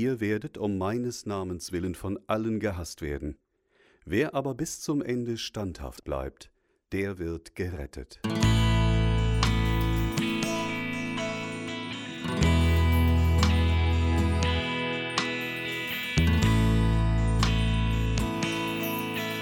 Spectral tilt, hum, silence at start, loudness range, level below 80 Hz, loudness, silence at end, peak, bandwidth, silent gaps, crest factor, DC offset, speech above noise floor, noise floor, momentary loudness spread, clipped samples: -5.5 dB/octave; none; 0 s; 8 LU; -32 dBFS; -28 LUFS; 0 s; -10 dBFS; 17.5 kHz; none; 16 dB; under 0.1%; 34 dB; -65 dBFS; 12 LU; under 0.1%